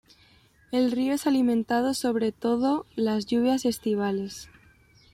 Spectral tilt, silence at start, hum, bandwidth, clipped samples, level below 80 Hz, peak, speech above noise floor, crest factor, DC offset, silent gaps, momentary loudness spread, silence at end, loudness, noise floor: -5 dB/octave; 0.7 s; none; 15.5 kHz; under 0.1%; -62 dBFS; -14 dBFS; 34 dB; 12 dB; under 0.1%; none; 6 LU; 0.65 s; -26 LUFS; -59 dBFS